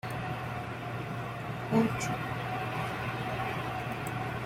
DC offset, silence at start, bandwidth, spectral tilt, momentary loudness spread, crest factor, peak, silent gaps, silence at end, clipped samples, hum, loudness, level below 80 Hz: under 0.1%; 0.05 s; 16 kHz; -6 dB/octave; 9 LU; 20 dB; -14 dBFS; none; 0 s; under 0.1%; none; -34 LUFS; -56 dBFS